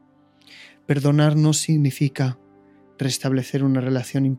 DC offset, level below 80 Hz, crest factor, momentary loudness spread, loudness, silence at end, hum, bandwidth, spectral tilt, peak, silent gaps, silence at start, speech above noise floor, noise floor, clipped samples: under 0.1%; -66 dBFS; 16 dB; 9 LU; -21 LUFS; 0 s; none; 15.5 kHz; -6 dB/octave; -6 dBFS; none; 0.6 s; 35 dB; -55 dBFS; under 0.1%